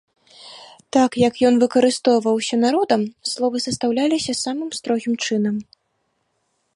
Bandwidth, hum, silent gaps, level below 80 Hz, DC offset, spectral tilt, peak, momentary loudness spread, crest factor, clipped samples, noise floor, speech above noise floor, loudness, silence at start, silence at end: 11.5 kHz; none; none; -60 dBFS; under 0.1%; -4 dB/octave; -2 dBFS; 9 LU; 18 dB; under 0.1%; -70 dBFS; 52 dB; -19 LUFS; 0.4 s; 1.15 s